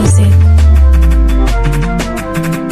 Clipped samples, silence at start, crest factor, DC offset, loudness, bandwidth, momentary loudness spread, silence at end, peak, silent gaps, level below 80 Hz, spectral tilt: under 0.1%; 0 s; 8 dB; under 0.1%; -10 LUFS; 14.5 kHz; 9 LU; 0 s; 0 dBFS; none; -10 dBFS; -6.5 dB/octave